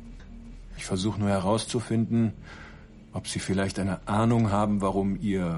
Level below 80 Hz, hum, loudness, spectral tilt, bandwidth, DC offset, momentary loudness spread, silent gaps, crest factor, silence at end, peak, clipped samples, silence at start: -46 dBFS; none; -27 LUFS; -6 dB/octave; 11.5 kHz; under 0.1%; 22 LU; none; 16 dB; 0 s; -12 dBFS; under 0.1%; 0 s